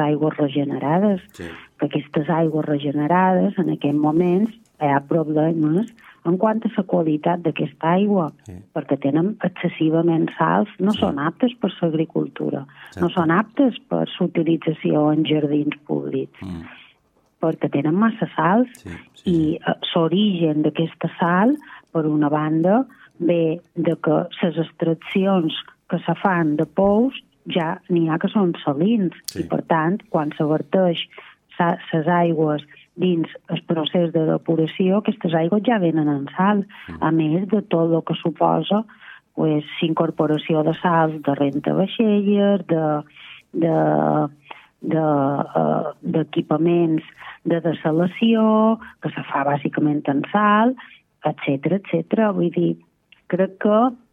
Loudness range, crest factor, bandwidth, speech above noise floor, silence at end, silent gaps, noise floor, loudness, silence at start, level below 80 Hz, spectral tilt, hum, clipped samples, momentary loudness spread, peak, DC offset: 2 LU; 18 dB; 12.5 kHz; 42 dB; 0.15 s; none; -62 dBFS; -20 LUFS; 0 s; -60 dBFS; -8 dB/octave; none; under 0.1%; 9 LU; -2 dBFS; under 0.1%